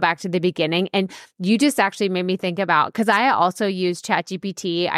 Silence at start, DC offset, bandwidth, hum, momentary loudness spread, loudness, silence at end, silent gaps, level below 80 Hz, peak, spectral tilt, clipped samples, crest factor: 0 s; under 0.1%; 15 kHz; none; 7 LU; -20 LUFS; 0 s; none; -70 dBFS; -4 dBFS; -4.5 dB/octave; under 0.1%; 16 dB